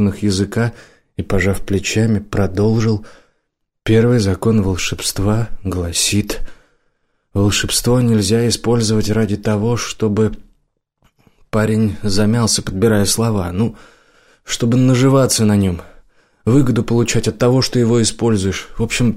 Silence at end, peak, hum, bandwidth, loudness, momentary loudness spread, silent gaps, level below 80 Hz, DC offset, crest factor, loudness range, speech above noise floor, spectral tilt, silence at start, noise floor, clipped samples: 0 s; -4 dBFS; none; 16 kHz; -16 LUFS; 8 LU; none; -34 dBFS; under 0.1%; 12 dB; 3 LU; 55 dB; -5 dB/octave; 0 s; -70 dBFS; under 0.1%